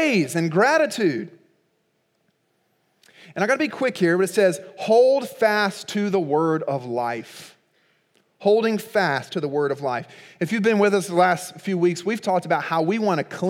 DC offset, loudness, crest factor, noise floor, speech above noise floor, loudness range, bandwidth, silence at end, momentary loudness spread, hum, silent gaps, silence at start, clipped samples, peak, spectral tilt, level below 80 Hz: under 0.1%; -21 LUFS; 18 dB; -69 dBFS; 48 dB; 4 LU; 16.5 kHz; 0 s; 10 LU; none; none; 0 s; under 0.1%; -6 dBFS; -5.5 dB/octave; -80 dBFS